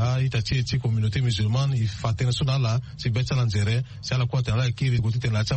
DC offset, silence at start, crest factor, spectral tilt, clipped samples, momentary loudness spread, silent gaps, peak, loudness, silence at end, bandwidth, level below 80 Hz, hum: under 0.1%; 0 s; 12 dB; -6 dB/octave; under 0.1%; 3 LU; none; -10 dBFS; -24 LUFS; 0 s; 8.8 kHz; -42 dBFS; none